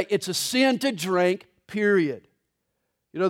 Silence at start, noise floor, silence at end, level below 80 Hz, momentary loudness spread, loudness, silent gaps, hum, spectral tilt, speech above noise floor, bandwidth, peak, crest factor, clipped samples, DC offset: 0 s; -78 dBFS; 0 s; -74 dBFS; 13 LU; -23 LUFS; none; none; -4 dB/octave; 54 dB; 17 kHz; -8 dBFS; 16 dB; under 0.1%; under 0.1%